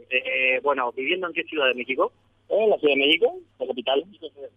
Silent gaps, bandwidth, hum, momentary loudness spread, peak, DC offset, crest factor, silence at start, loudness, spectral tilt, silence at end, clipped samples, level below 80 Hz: none; 5 kHz; none; 10 LU; -6 dBFS; under 0.1%; 18 dB; 0.1 s; -23 LUFS; -5 dB/octave; 0.1 s; under 0.1%; -72 dBFS